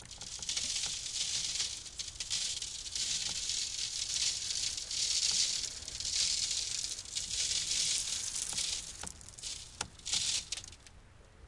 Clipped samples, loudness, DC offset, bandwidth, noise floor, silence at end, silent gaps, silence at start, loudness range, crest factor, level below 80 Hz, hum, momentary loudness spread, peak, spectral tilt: under 0.1%; -33 LUFS; under 0.1%; 12 kHz; -57 dBFS; 0 s; none; 0 s; 3 LU; 22 dB; -58 dBFS; none; 12 LU; -16 dBFS; 1.5 dB/octave